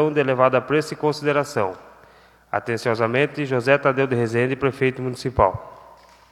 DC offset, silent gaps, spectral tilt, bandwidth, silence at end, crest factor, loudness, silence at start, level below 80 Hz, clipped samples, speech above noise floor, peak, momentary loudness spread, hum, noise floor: under 0.1%; none; -6.5 dB/octave; 13.5 kHz; 0.5 s; 20 dB; -21 LUFS; 0 s; -46 dBFS; under 0.1%; 31 dB; 0 dBFS; 9 LU; none; -51 dBFS